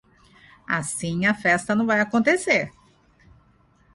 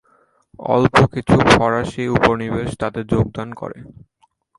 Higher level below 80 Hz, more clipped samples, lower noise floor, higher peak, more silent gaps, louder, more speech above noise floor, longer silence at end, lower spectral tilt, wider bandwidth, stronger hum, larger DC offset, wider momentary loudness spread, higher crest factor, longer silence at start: second, -58 dBFS vs -38 dBFS; neither; about the same, -59 dBFS vs -58 dBFS; second, -6 dBFS vs 0 dBFS; neither; second, -22 LUFS vs -17 LUFS; second, 37 dB vs 41 dB; first, 1.25 s vs 0.7 s; second, -4.5 dB/octave vs -6 dB/octave; about the same, 11.5 kHz vs 11.5 kHz; neither; neither; second, 7 LU vs 16 LU; about the same, 18 dB vs 18 dB; about the same, 0.7 s vs 0.6 s